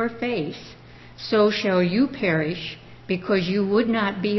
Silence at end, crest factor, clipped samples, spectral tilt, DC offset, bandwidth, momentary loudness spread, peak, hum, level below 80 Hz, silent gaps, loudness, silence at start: 0 s; 14 dB; under 0.1%; -7 dB/octave; under 0.1%; 6.2 kHz; 15 LU; -8 dBFS; none; -56 dBFS; none; -23 LUFS; 0 s